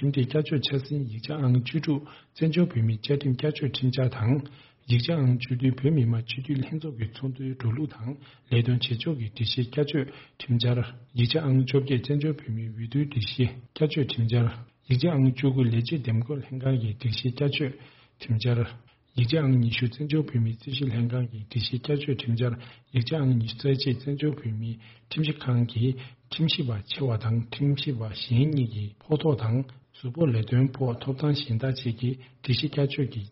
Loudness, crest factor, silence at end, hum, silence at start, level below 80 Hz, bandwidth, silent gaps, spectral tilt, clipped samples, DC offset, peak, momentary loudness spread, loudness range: -27 LUFS; 16 dB; 0 s; none; 0 s; -58 dBFS; 5.8 kHz; none; -6.5 dB/octave; under 0.1%; under 0.1%; -10 dBFS; 9 LU; 2 LU